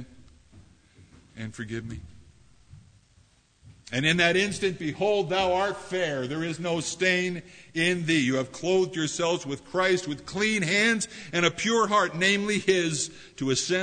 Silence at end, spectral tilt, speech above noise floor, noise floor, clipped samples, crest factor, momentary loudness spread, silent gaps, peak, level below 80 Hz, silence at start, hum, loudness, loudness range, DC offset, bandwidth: 0 s; -3.5 dB/octave; 35 dB; -61 dBFS; under 0.1%; 20 dB; 12 LU; none; -6 dBFS; -58 dBFS; 0 s; none; -26 LUFS; 11 LU; under 0.1%; 9.6 kHz